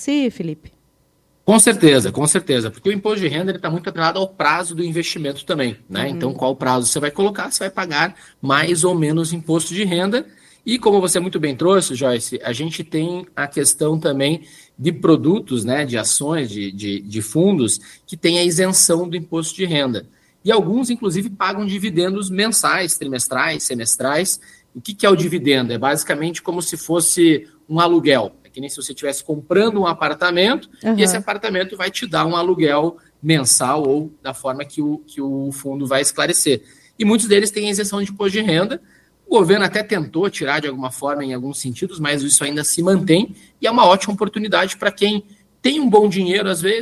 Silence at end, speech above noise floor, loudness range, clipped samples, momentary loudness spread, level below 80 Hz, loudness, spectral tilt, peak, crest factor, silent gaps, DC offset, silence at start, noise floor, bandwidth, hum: 0 s; 42 dB; 3 LU; under 0.1%; 11 LU; -58 dBFS; -18 LUFS; -3.5 dB/octave; 0 dBFS; 18 dB; none; under 0.1%; 0 s; -60 dBFS; 15 kHz; none